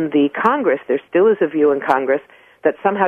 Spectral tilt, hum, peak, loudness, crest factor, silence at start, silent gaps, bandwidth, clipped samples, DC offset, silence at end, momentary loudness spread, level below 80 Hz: -7.5 dB/octave; none; 0 dBFS; -17 LUFS; 16 dB; 0 s; none; 4.9 kHz; under 0.1%; under 0.1%; 0 s; 6 LU; -62 dBFS